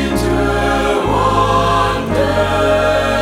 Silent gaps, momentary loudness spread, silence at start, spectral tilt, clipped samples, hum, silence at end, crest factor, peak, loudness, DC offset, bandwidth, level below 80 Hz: none; 2 LU; 0 s; -5.5 dB/octave; under 0.1%; none; 0 s; 12 dB; -2 dBFS; -14 LUFS; under 0.1%; 16 kHz; -26 dBFS